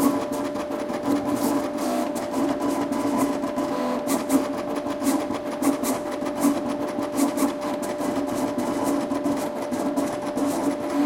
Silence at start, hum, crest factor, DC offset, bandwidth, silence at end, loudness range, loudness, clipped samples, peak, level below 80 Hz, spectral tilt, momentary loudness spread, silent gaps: 0 s; none; 16 dB; under 0.1%; 16.5 kHz; 0 s; 1 LU; -25 LUFS; under 0.1%; -8 dBFS; -56 dBFS; -4.5 dB/octave; 4 LU; none